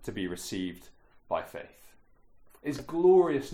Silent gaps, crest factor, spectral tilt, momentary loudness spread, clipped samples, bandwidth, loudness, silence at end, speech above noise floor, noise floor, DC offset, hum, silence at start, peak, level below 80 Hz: none; 18 dB; -6 dB/octave; 18 LU; under 0.1%; 15.5 kHz; -29 LUFS; 0 s; 29 dB; -57 dBFS; under 0.1%; none; 0 s; -12 dBFS; -58 dBFS